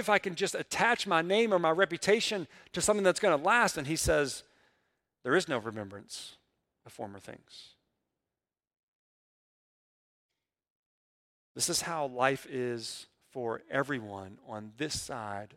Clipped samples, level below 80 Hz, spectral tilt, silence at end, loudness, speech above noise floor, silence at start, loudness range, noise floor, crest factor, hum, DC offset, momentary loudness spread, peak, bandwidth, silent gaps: under 0.1%; -58 dBFS; -3 dB/octave; 0.1 s; -30 LUFS; over 59 dB; 0 s; 21 LU; under -90 dBFS; 22 dB; none; under 0.1%; 18 LU; -10 dBFS; 16 kHz; 8.79-10.29 s, 10.70-11.55 s